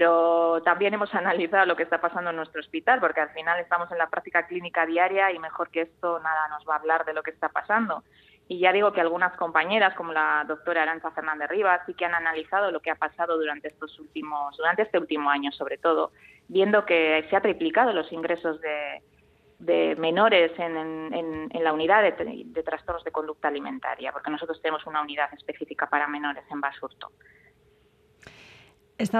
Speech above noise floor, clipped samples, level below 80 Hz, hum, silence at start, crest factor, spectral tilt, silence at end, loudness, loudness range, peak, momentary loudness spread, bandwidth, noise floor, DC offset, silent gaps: 36 dB; under 0.1%; -66 dBFS; none; 0 s; 22 dB; -5.5 dB/octave; 0 s; -25 LUFS; 6 LU; -4 dBFS; 11 LU; 10 kHz; -62 dBFS; under 0.1%; none